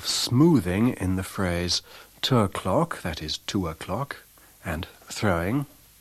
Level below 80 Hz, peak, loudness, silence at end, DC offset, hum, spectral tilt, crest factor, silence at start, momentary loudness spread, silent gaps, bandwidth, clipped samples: -48 dBFS; -8 dBFS; -26 LUFS; 0.35 s; under 0.1%; none; -5 dB/octave; 18 dB; 0 s; 14 LU; none; 15 kHz; under 0.1%